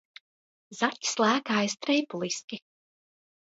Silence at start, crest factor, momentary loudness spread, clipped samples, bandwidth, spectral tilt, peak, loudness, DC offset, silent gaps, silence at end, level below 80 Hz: 0.7 s; 22 dB; 16 LU; under 0.1%; 8 kHz; -3 dB/octave; -8 dBFS; -28 LUFS; under 0.1%; 2.44-2.48 s; 0.85 s; -80 dBFS